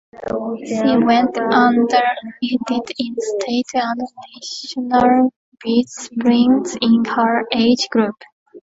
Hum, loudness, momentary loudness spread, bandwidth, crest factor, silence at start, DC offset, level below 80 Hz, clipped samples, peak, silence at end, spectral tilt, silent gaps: none; -17 LUFS; 12 LU; 7.8 kHz; 16 dB; 0.15 s; under 0.1%; -56 dBFS; under 0.1%; 0 dBFS; 0.05 s; -4.5 dB/octave; 5.36-5.52 s, 8.32-8.46 s